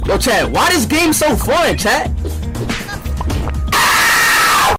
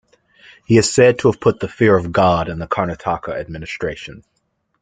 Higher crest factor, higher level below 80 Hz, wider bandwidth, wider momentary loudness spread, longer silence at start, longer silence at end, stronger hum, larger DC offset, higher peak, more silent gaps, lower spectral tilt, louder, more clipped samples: second, 10 dB vs 16 dB; first, -24 dBFS vs -44 dBFS; first, 16.5 kHz vs 9.6 kHz; about the same, 12 LU vs 14 LU; second, 0 s vs 0.7 s; second, 0 s vs 0.65 s; neither; neither; about the same, -4 dBFS vs -2 dBFS; neither; second, -3 dB/octave vs -5.5 dB/octave; first, -13 LUFS vs -17 LUFS; neither